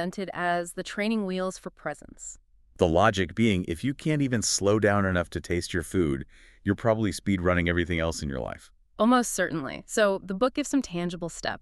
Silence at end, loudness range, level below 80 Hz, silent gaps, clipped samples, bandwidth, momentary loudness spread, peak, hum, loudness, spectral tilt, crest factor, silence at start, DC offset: 0.05 s; 3 LU; -48 dBFS; none; under 0.1%; 13.5 kHz; 12 LU; -6 dBFS; none; -27 LUFS; -5 dB/octave; 20 dB; 0 s; under 0.1%